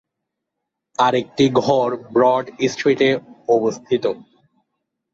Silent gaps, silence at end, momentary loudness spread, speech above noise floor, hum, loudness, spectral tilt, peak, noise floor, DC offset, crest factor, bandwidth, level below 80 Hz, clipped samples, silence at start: none; 0.95 s; 7 LU; 63 dB; none; -18 LUFS; -5.5 dB/octave; -2 dBFS; -80 dBFS; under 0.1%; 16 dB; 7.8 kHz; -60 dBFS; under 0.1%; 1 s